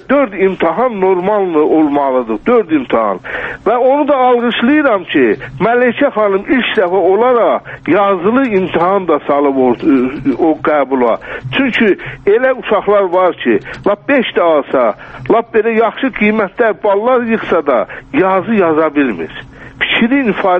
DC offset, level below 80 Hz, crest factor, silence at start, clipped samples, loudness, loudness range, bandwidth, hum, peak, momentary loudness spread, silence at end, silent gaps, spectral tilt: under 0.1%; -46 dBFS; 12 dB; 0.1 s; under 0.1%; -12 LUFS; 1 LU; 5.6 kHz; none; 0 dBFS; 5 LU; 0 s; none; -8 dB/octave